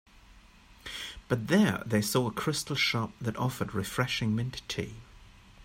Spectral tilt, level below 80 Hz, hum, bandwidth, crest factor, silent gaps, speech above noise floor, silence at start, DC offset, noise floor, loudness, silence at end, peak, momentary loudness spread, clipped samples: -5 dB/octave; -56 dBFS; none; 16 kHz; 18 dB; none; 26 dB; 0.15 s; under 0.1%; -56 dBFS; -30 LUFS; 0 s; -12 dBFS; 14 LU; under 0.1%